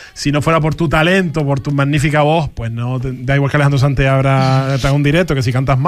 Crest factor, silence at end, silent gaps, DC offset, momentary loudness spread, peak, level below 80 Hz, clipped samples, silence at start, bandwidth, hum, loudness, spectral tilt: 12 dB; 0 s; none; under 0.1%; 7 LU; -2 dBFS; -32 dBFS; under 0.1%; 0 s; 12.5 kHz; none; -14 LUFS; -6.5 dB/octave